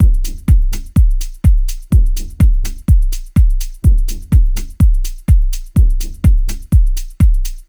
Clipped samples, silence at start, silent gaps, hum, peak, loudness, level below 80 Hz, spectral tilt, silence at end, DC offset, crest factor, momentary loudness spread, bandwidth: under 0.1%; 0 s; none; none; 0 dBFS; -16 LUFS; -12 dBFS; -6.5 dB/octave; 0.05 s; under 0.1%; 12 dB; 4 LU; over 20 kHz